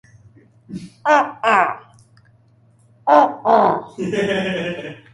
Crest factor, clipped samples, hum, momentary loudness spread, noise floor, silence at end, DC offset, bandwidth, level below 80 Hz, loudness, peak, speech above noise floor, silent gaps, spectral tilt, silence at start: 18 dB; under 0.1%; none; 19 LU; -54 dBFS; 0.2 s; under 0.1%; 11.5 kHz; -58 dBFS; -17 LUFS; 0 dBFS; 36 dB; none; -5.5 dB/octave; 0.7 s